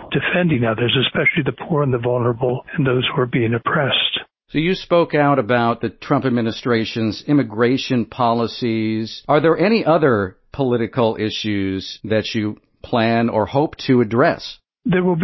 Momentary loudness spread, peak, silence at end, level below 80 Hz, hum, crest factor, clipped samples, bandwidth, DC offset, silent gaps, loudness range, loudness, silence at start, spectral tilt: 8 LU; -2 dBFS; 0 s; -48 dBFS; none; 16 dB; under 0.1%; 6.2 kHz; under 0.1%; none; 2 LU; -18 LUFS; 0 s; -7 dB/octave